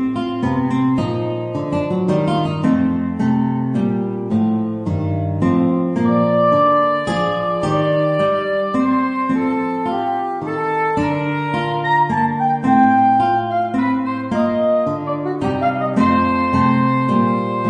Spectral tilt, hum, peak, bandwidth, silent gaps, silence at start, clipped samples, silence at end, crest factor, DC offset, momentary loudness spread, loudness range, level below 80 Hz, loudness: -8 dB/octave; none; -2 dBFS; 9.6 kHz; none; 0 s; under 0.1%; 0 s; 14 dB; under 0.1%; 7 LU; 2 LU; -50 dBFS; -18 LUFS